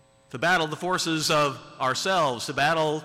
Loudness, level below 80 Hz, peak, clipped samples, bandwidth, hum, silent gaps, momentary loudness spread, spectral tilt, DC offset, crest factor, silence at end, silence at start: -24 LUFS; -60 dBFS; -14 dBFS; under 0.1%; 16 kHz; none; none; 5 LU; -3.5 dB/octave; under 0.1%; 12 dB; 0 s; 0.35 s